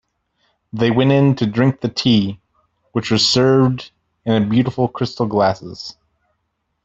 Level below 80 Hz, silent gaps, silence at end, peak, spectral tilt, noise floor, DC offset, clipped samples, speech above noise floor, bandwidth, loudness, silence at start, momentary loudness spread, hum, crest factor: -52 dBFS; none; 0.95 s; -2 dBFS; -6 dB/octave; -71 dBFS; under 0.1%; under 0.1%; 55 dB; 8 kHz; -17 LUFS; 0.75 s; 15 LU; none; 16 dB